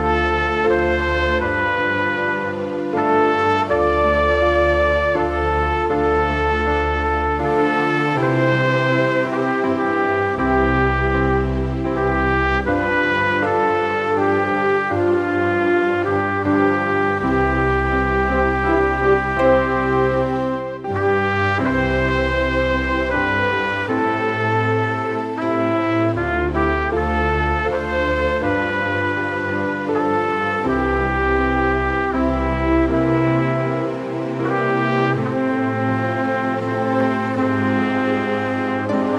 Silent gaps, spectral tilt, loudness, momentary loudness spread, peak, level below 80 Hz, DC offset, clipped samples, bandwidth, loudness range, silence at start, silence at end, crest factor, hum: none; -7.5 dB/octave; -19 LUFS; 4 LU; -4 dBFS; -32 dBFS; under 0.1%; under 0.1%; 10.5 kHz; 2 LU; 0 s; 0 s; 14 dB; none